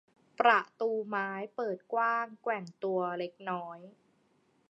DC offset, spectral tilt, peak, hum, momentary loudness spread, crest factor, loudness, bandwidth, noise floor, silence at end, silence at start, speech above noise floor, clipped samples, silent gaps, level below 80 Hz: under 0.1%; -6 dB/octave; -10 dBFS; none; 12 LU; 24 dB; -32 LUFS; 7.8 kHz; -71 dBFS; 0.8 s; 0.4 s; 38 dB; under 0.1%; none; under -90 dBFS